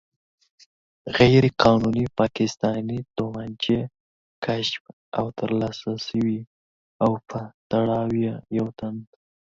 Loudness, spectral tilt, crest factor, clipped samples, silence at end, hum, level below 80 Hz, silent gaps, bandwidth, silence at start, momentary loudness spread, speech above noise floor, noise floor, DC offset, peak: -24 LUFS; -6.5 dB/octave; 24 dB; under 0.1%; 0.5 s; none; -52 dBFS; 4.00-4.42 s, 4.80-4.85 s, 4.93-5.12 s, 6.47-7.00 s, 7.54-7.70 s; 7.6 kHz; 1.05 s; 15 LU; over 67 dB; under -90 dBFS; under 0.1%; 0 dBFS